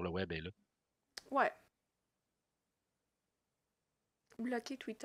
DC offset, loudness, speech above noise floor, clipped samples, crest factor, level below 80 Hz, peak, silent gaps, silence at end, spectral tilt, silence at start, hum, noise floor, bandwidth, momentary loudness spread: under 0.1%; -40 LUFS; 49 dB; under 0.1%; 26 dB; -74 dBFS; -18 dBFS; none; 0 s; -5.5 dB/octave; 0 s; none; -88 dBFS; 15.5 kHz; 18 LU